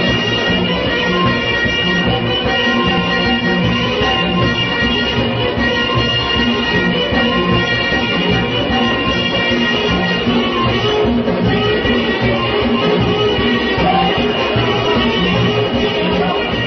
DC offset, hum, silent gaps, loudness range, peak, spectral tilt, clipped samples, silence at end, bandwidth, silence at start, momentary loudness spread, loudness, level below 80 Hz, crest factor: under 0.1%; none; none; 0 LU; -2 dBFS; -6 dB/octave; under 0.1%; 0 s; 6.4 kHz; 0 s; 1 LU; -14 LUFS; -32 dBFS; 12 dB